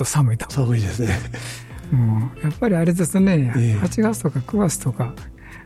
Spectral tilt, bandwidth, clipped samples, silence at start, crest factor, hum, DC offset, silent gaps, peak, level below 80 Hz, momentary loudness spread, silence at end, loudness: -6.5 dB/octave; 15 kHz; under 0.1%; 0 s; 14 dB; none; under 0.1%; none; -6 dBFS; -42 dBFS; 13 LU; 0 s; -20 LUFS